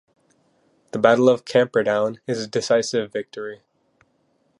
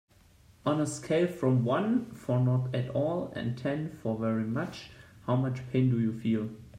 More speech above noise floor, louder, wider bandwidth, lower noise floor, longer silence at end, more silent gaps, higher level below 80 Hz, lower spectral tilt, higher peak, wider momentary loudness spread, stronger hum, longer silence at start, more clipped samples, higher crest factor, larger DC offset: first, 46 dB vs 30 dB; first, -20 LUFS vs -30 LUFS; about the same, 11.5 kHz vs 11 kHz; first, -66 dBFS vs -59 dBFS; first, 1.05 s vs 0 s; neither; second, -70 dBFS vs -62 dBFS; second, -5 dB/octave vs -7.5 dB/octave; first, -2 dBFS vs -14 dBFS; first, 16 LU vs 8 LU; neither; first, 0.95 s vs 0.65 s; neither; about the same, 20 dB vs 16 dB; neither